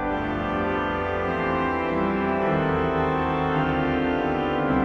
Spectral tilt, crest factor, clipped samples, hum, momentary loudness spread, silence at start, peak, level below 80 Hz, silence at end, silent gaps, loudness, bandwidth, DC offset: -8 dB/octave; 14 dB; under 0.1%; none; 3 LU; 0 s; -8 dBFS; -40 dBFS; 0 s; none; -24 LUFS; 7 kHz; under 0.1%